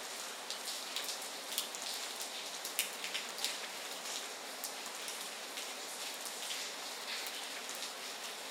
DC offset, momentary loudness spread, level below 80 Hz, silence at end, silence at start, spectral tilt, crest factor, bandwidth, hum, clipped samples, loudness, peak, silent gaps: under 0.1%; 4 LU; under -90 dBFS; 0 s; 0 s; 1.5 dB/octave; 34 dB; 18 kHz; none; under 0.1%; -40 LUFS; -8 dBFS; none